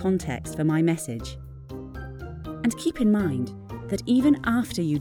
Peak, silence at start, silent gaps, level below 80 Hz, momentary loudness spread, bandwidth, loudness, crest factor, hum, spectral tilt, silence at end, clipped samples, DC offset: -10 dBFS; 0 s; none; -44 dBFS; 17 LU; 18.5 kHz; -25 LUFS; 14 dB; none; -6.5 dB/octave; 0 s; under 0.1%; under 0.1%